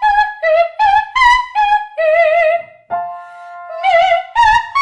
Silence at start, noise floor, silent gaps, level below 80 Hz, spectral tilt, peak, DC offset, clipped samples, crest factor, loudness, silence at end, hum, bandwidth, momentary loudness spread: 0 s; -32 dBFS; none; -40 dBFS; -1 dB/octave; 0 dBFS; under 0.1%; under 0.1%; 12 dB; -13 LUFS; 0 s; none; 10.5 kHz; 15 LU